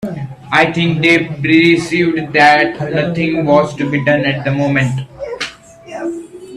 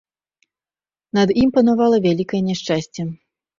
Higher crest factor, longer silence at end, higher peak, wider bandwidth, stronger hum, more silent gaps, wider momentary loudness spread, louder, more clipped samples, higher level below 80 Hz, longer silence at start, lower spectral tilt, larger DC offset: about the same, 14 dB vs 16 dB; second, 0 s vs 0.45 s; first, 0 dBFS vs -4 dBFS; first, 11.5 kHz vs 7.4 kHz; neither; neither; first, 15 LU vs 12 LU; first, -13 LUFS vs -18 LUFS; neither; about the same, -48 dBFS vs -48 dBFS; second, 0 s vs 1.15 s; about the same, -6 dB/octave vs -6.5 dB/octave; neither